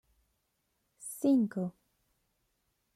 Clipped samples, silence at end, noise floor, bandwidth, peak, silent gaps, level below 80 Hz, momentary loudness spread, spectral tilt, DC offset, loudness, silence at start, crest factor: under 0.1%; 1.25 s; -80 dBFS; 15 kHz; -18 dBFS; none; -78 dBFS; 16 LU; -7 dB/octave; under 0.1%; -31 LUFS; 1 s; 18 dB